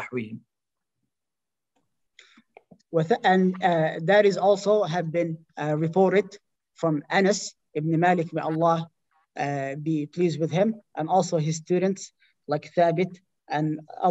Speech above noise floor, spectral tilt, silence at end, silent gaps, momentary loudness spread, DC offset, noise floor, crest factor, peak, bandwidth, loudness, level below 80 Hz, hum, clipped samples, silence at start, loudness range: 66 dB; -6 dB/octave; 0 s; none; 11 LU; under 0.1%; -89 dBFS; 18 dB; -6 dBFS; 8.2 kHz; -24 LUFS; -74 dBFS; none; under 0.1%; 0 s; 4 LU